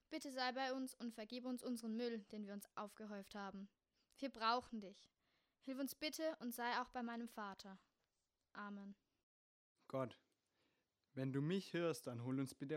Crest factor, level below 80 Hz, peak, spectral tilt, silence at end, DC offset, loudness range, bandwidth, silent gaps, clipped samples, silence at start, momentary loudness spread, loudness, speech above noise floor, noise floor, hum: 22 dB; -84 dBFS; -26 dBFS; -5 dB/octave; 0 s; under 0.1%; 8 LU; 16 kHz; 9.23-9.75 s; under 0.1%; 0.1 s; 14 LU; -47 LUFS; over 43 dB; under -90 dBFS; none